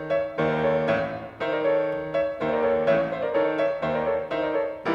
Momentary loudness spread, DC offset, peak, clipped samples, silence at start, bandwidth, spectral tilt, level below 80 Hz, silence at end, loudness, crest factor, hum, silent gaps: 4 LU; under 0.1%; -12 dBFS; under 0.1%; 0 s; 6.8 kHz; -7.5 dB/octave; -54 dBFS; 0 s; -25 LUFS; 12 dB; none; none